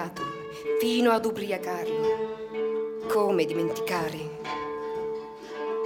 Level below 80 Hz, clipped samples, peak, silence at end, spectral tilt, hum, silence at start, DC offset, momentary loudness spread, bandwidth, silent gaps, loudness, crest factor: -64 dBFS; under 0.1%; -10 dBFS; 0 s; -5 dB/octave; none; 0 s; under 0.1%; 11 LU; 18 kHz; none; -28 LUFS; 18 dB